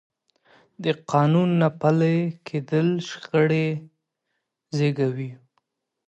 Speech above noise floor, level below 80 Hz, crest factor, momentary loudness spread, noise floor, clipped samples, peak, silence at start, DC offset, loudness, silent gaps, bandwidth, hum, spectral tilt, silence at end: 57 dB; -68 dBFS; 18 dB; 12 LU; -79 dBFS; under 0.1%; -6 dBFS; 0.8 s; under 0.1%; -23 LUFS; none; 8 kHz; none; -7.5 dB/octave; 0.7 s